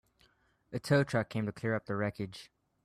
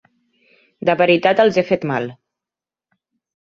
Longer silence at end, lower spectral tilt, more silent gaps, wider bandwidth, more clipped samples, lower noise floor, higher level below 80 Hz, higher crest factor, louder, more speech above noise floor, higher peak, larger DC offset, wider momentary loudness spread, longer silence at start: second, 0.4 s vs 1.3 s; about the same, -6.5 dB/octave vs -6.5 dB/octave; neither; first, 14 kHz vs 7.2 kHz; neither; second, -70 dBFS vs -89 dBFS; about the same, -66 dBFS vs -62 dBFS; about the same, 18 dB vs 18 dB; second, -34 LUFS vs -16 LUFS; second, 37 dB vs 73 dB; second, -16 dBFS vs -2 dBFS; neither; first, 14 LU vs 10 LU; second, 0.7 s vs 0.85 s